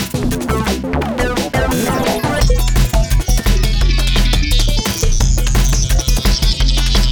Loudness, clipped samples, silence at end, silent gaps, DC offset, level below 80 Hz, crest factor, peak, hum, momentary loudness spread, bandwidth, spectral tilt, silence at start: -16 LUFS; under 0.1%; 0 s; none; under 0.1%; -14 dBFS; 12 dB; 0 dBFS; none; 3 LU; over 20 kHz; -4 dB/octave; 0 s